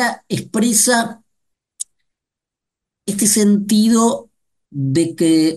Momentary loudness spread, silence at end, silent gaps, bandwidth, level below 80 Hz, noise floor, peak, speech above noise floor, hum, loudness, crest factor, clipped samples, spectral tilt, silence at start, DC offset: 17 LU; 0 s; none; 12.5 kHz; -60 dBFS; -85 dBFS; -2 dBFS; 70 dB; none; -15 LUFS; 16 dB; under 0.1%; -4 dB/octave; 0 s; under 0.1%